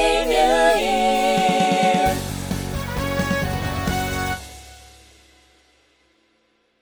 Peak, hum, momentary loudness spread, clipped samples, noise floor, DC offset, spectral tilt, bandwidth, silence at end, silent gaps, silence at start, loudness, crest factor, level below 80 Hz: -4 dBFS; none; 10 LU; under 0.1%; -64 dBFS; under 0.1%; -4.5 dB/octave; over 20 kHz; 2 s; none; 0 s; -20 LUFS; 18 dB; -36 dBFS